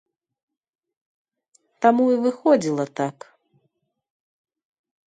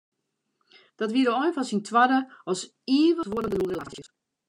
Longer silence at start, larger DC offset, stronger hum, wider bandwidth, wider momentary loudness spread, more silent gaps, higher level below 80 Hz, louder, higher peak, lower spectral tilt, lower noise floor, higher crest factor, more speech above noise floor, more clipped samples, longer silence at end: first, 1.8 s vs 1 s; neither; neither; second, 9.4 kHz vs 11 kHz; about the same, 10 LU vs 11 LU; neither; second, -74 dBFS vs -60 dBFS; first, -21 LUFS vs -25 LUFS; first, -2 dBFS vs -8 dBFS; first, -6.5 dB/octave vs -4.5 dB/octave; about the same, -73 dBFS vs -76 dBFS; about the same, 22 dB vs 18 dB; about the same, 53 dB vs 52 dB; neither; first, 1.95 s vs 0.45 s